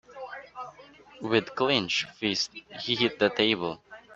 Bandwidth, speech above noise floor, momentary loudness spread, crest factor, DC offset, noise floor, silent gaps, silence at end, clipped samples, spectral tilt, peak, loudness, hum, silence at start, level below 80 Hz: 8.2 kHz; 24 dB; 18 LU; 22 dB; under 0.1%; -52 dBFS; none; 0 s; under 0.1%; -3.5 dB/octave; -6 dBFS; -27 LUFS; none; 0.1 s; -66 dBFS